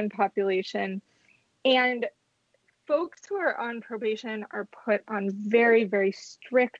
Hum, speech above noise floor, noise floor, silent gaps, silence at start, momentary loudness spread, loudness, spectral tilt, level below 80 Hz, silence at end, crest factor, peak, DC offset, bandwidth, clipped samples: none; 45 dB; -71 dBFS; none; 0 s; 12 LU; -27 LUFS; -5 dB/octave; -80 dBFS; 0 s; 18 dB; -10 dBFS; under 0.1%; 7.8 kHz; under 0.1%